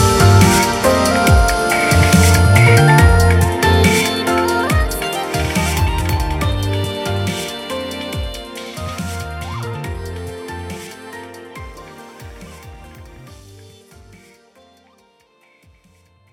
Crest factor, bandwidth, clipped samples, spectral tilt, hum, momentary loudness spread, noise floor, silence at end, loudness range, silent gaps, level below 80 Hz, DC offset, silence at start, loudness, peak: 16 dB; 16.5 kHz; under 0.1%; -5 dB/octave; none; 23 LU; -55 dBFS; 3 s; 21 LU; none; -26 dBFS; under 0.1%; 0 s; -14 LUFS; 0 dBFS